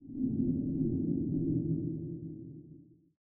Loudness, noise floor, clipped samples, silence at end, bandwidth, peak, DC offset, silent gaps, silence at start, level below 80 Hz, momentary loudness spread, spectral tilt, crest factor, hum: -34 LUFS; -56 dBFS; under 0.1%; 0.4 s; 0.9 kHz; -20 dBFS; under 0.1%; none; 0 s; -56 dBFS; 14 LU; -16 dB/octave; 14 dB; none